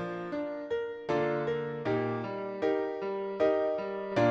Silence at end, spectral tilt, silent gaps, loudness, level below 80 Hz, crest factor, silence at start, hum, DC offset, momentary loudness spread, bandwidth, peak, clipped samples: 0 s; -7.5 dB/octave; none; -32 LUFS; -66 dBFS; 16 dB; 0 s; none; under 0.1%; 7 LU; 7.6 kHz; -16 dBFS; under 0.1%